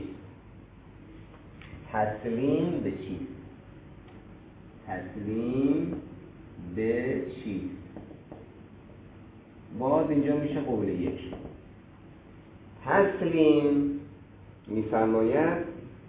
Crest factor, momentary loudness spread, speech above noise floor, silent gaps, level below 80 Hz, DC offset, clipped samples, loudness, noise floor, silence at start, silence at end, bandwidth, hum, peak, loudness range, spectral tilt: 20 dB; 25 LU; 23 dB; none; -54 dBFS; under 0.1%; under 0.1%; -28 LUFS; -51 dBFS; 0 s; 0 s; 4 kHz; none; -10 dBFS; 8 LU; -6.5 dB/octave